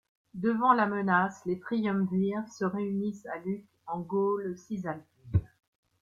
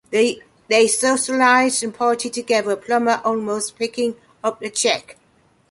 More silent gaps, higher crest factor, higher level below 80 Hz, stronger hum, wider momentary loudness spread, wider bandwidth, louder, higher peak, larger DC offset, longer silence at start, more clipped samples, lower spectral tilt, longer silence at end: neither; about the same, 22 dB vs 18 dB; first, -54 dBFS vs -66 dBFS; neither; first, 13 LU vs 10 LU; second, 7.4 kHz vs 11.5 kHz; second, -30 LUFS vs -19 LUFS; second, -10 dBFS vs -2 dBFS; neither; first, 0.35 s vs 0.1 s; neither; first, -8 dB/octave vs -2 dB/octave; about the same, 0.55 s vs 0.6 s